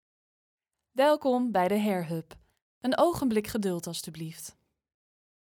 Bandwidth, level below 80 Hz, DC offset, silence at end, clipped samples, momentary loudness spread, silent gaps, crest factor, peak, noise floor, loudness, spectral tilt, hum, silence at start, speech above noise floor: 19.5 kHz; -62 dBFS; under 0.1%; 0.95 s; under 0.1%; 14 LU; 2.62-2.81 s; 18 dB; -12 dBFS; under -90 dBFS; -28 LUFS; -5.5 dB/octave; none; 0.95 s; over 62 dB